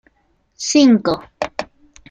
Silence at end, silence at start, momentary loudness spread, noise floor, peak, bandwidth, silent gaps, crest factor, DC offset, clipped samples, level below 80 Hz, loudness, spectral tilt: 0.45 s; 0.6 s; 17 LU; -62 dBFS; -2 dBFS; 9.4 kHz; none; 16 dB; under 0.1%; under 0.1%; -52 dBFS; -16 LUFS; -4 dB/octave